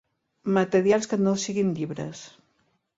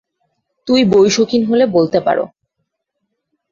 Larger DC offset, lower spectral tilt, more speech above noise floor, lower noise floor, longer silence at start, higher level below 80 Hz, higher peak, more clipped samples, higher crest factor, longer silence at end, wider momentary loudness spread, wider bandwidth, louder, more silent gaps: neither; about the same, -5.5 dB/octave vs -5 dB/octave; second, 46 dB vs 61 dB; about the same, -70 dBFS vs -73 dBFS; second, 0.45 s vs 0.65 s; second, -66 dBFS vs -54 dBFS; second, -8 dBFS vs -2 dBFS; neither; about the same, 18 dB vs 14 dB; second, 0.7 s vs 1.25 s; first, 14 LU vs 10 LU; about the same, 7.8 kHz vs 7.6 kHz; second, -25 LUFS vs -13 LUFS; neither